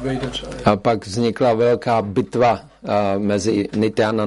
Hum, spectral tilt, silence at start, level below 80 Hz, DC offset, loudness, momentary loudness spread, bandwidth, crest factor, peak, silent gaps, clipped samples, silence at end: none; -6 dB/octave; 0 s; -46 dBFS; under 0.1%; -19 LUFS; 6 LU; 11.5 kHz; 18 dB; -2 dBFS; none; under 0.1%; 0 s